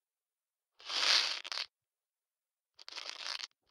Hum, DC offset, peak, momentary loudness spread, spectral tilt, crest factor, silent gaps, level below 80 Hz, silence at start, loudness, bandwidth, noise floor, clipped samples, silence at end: none; under 0.1%; -12 dBFS; 17 LU; 3.5 dB/octave; 28 dB; none; under -90 dBFS; 0.8 s; -33 LUFS; 17.5 kHz; under -90 dBFS; under 0.1%; 0.25 s